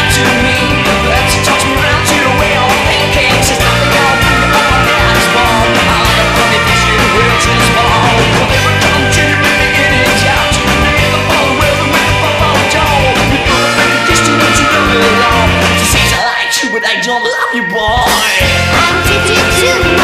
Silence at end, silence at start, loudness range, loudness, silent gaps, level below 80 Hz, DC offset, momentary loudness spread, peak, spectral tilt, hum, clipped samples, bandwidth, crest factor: 0 s; 0 s; 1 LU; -8 LUFS; none; -22 dBFS; under 0.1%; 2 LU; 0 dBFS; -3.5 dB/octave; none; under 0.1%; 15.5 kHz; 10 dB